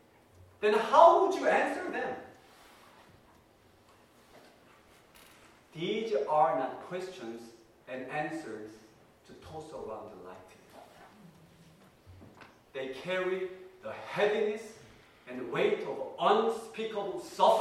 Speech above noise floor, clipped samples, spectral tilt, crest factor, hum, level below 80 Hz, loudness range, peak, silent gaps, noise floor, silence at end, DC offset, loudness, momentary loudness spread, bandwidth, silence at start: 32 dB; under 0.1%; -4.5 dB/octave; 26 dB; none; -72 dBFS; 20 LU; -8 dBFS; none; -62 dBFS; 0 s; under 0.1%; -30 LUFS; 20 LU; 14.5 kHz; 0.6 s